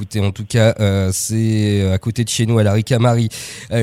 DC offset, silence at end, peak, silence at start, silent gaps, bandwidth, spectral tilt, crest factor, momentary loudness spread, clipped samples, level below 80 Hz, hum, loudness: under 0.1%; 0 s; 0 dBFS; 0 s; none; 15.5 kHz; -5.5 dB/octave; 14 dB; 6 LU; under 0.1%; -46 dBFS; none; -16 LUFS